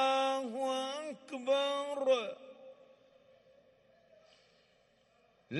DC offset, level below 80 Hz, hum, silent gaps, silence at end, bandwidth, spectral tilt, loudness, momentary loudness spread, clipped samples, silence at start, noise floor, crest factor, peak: under 0.1%; -88 dBFS; none; none; 0 s; 11.5 kHz; -3.5 dB/octave; -34 LUFS; 20 LU; under 0.1%; 0 s; -70 dBFS; 18 dB; -18 dBFS